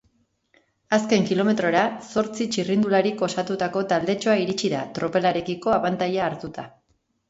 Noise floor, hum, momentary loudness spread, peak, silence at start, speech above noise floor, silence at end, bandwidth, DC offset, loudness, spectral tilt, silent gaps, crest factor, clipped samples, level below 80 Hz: -69 dBFS; none; 6 LU; -6 dBFS; 0.9 s; 46 dB; 0.6 s; 8 kHz; under 0.1%; -23 LUFS; -5 dB/octave; none; 18 dB; under 0.1%; -60 dBFS